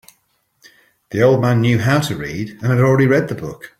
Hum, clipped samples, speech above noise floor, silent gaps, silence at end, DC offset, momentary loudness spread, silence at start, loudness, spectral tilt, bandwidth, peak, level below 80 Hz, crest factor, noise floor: none; under 0.1%; 48 dB; none; 0.1 s; under 0.1%; 12 LU; 1.1 s; -16 LUFS; -7 dB/octave; 15.5 kHz; -2 dBFS; -50 dBFS; 16 dB; -63 dBFS